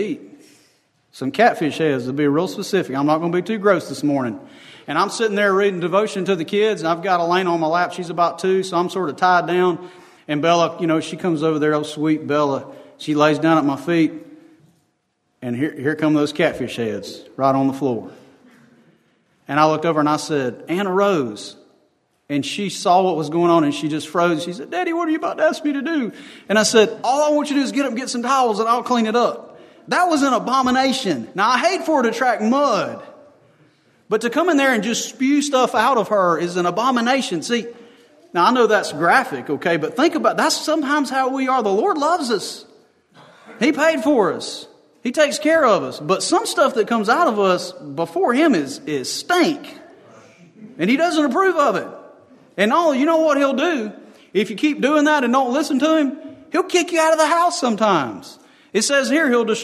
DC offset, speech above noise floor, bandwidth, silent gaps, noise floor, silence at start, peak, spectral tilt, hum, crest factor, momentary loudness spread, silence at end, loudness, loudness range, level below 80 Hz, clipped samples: under 0.1%; 50 dB; 13.5 kHz; none; -68 dBFS; 0 s; 0 dBFS; -4.5 dB/octave; none; 18 dB; 9 LU; 0 s; -18 LUFS; 3 LU; -68 dBFS; under 0.1%